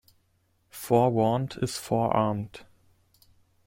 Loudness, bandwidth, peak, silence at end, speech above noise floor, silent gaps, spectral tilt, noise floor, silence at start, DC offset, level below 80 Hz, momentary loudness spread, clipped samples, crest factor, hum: -26 LUFS; 16.5 kHz; -8 dBFS; 1 s; 44 dB; none; -6.5 dB/octave; -69 dBFS; 0.75 s; under 0.1%; -60 dBFS; 18 LU; under 0.1%; 20 dB; none